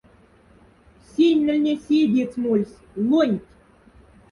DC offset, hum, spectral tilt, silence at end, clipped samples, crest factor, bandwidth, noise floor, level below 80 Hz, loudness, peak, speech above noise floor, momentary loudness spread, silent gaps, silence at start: under 0.1%; none; -7 dB/octave; 0.9 s; under 0.1%; 16 dB; 10.5 kHz; -53 dBFS; -58 dBFS; -21 LUFS; -8 dBFS; 33 dB; 10 LU; none; 1.2 s